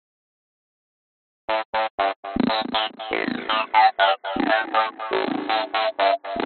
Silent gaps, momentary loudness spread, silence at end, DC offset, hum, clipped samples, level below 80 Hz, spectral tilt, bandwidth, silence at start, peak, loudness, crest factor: 1.65-1.73 s, 1.90-1.98 s, 2.16-2.23 s; 8 LU; 0 s; under 0.1%; none; under 0.1%; -56 dBFS; -0.5 dB/octave; 4.6 kHz; 1.5 s; -4 dBFS; -22 LUFS; 18 dB